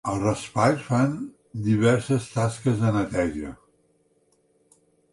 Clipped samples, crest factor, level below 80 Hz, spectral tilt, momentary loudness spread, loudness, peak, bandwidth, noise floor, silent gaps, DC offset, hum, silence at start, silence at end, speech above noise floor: under 0.1%; 18 dB; -50 dBFS; -6.5 dB/octave; 12 LU; -24 LUFS; -6 dBFS; 11.5 kHz; -65 dBFS; none; under 0.1%; none; 0.05 s; 1.6 s; 42 dB